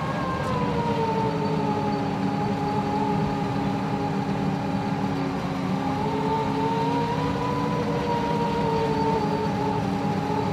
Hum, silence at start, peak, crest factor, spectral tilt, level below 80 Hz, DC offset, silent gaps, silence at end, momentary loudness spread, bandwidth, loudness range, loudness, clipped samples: none; 0 s; -12 dBFS; 12 dB; -7 dB/octave; -48 dBFS; under 0.1%; none; 0 s; 2 LU; 14 kHz; 1 LU; -25 LUFS; under 0.1%